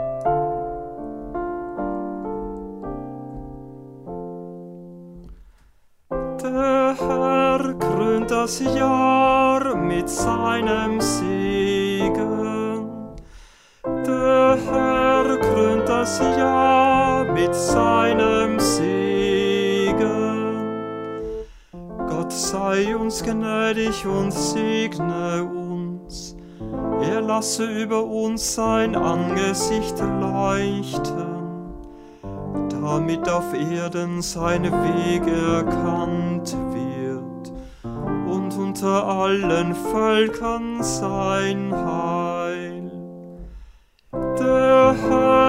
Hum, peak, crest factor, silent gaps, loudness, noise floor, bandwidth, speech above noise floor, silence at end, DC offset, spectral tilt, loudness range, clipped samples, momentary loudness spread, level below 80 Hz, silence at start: none; -2 dBFS; 20 dB; none; -21 LUFS; -54 dBFS; 16 kHz; 33 dB; 0 s; under 0.1%; -5 dB/octave; 8 LU; under 0.1%; 17 LU; -42 dBFS; 0 s